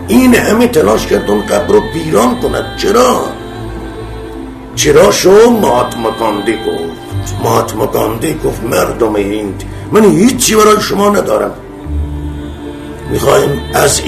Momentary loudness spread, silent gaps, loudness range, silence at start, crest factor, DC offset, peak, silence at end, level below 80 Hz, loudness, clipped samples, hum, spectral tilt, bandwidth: 17 LU; none; 4 LU; 0 s; 10 dB; under 0.1%; 0 dBFS; 0 s; -28 dBFS; -10 LUFS; 0.6%; none; -4.5 dB/octave; 14.5 kHz